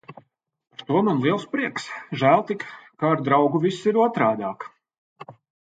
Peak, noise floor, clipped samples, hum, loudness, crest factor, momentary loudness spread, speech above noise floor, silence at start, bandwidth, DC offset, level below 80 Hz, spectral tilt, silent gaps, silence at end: -4 dBFS; -57 dBFS; under 0.1%; none; -22 LUFS; 20 dB; 17 LU; 36 dB; 0.1 s; 9.2 kHz; under 0.1%; -70 dBFS; -7 dB/octave; 4.98-5.16 s; 0.35 s